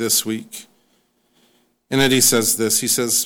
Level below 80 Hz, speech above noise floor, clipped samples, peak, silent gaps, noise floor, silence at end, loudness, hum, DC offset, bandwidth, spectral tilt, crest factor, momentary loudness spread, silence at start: -56 dBFS; 45 dB; under 0.1%; -4 dBFS; none; -63 dBFS; 0 s; -16 LUFS; none; under 0.1%; over 20 kHz; -2 dB/octave; 16 dB; 17 LU; 0 s